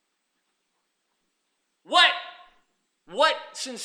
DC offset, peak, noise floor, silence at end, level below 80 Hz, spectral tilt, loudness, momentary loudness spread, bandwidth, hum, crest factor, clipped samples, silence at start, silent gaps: under 0.1%; -4 dBFS; -76 dBFS; 0 s; -78 dBFS; 0.5 dB/octave; -21 LUFS; 18 LU; 15.5 kHz; none; 24 dB; under 0.1%; 1.9 s; none